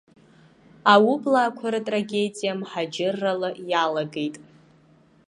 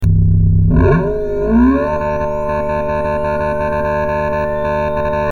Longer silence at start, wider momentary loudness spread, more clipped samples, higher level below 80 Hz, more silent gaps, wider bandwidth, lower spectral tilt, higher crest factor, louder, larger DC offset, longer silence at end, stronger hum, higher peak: first, 0.85 s vs 0 s; first, 12 LU vs 6 LU; neither; second, -74 dBFS vs -22 dBFS; neither; first, 11.5 kHz vs 6.8 kHz; second, -5 dB/octave vs -9.5 dB/octave; first, 22 dB vs 12 dB; second, -23 LUFS vs -15 LUFS; second, under 0.1% vs 2%; first, 0.85 s vs 0 s; neither; about the same, -2 dBFS vs -2 dBFS